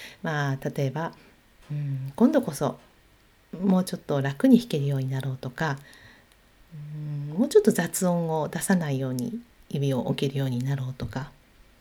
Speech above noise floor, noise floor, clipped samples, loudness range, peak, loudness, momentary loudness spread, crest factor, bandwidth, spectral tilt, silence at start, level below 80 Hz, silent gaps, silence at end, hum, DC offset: 33 dB; -59 dBFS; under 0.1%; 3 LU; -6 dBFS; -26 LUFS; 15 LU; 22 dB; 19 kHz; -6.5 dB/octave; 0 s; -58 dBFS; none; 0.5 s; none; under 0.1%